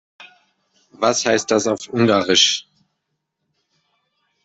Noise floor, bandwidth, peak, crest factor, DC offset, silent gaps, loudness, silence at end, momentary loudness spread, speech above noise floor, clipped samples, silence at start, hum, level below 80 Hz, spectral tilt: -76 dBFS; 8.4 kHz; -2 dBFS; 20 dB; under 0.1%; none; -17 LUFS; 1.85 s; 8 LU; 58 dB; under 0.1%; 0.2 s; none; -64 dBFS; -3 dB/octave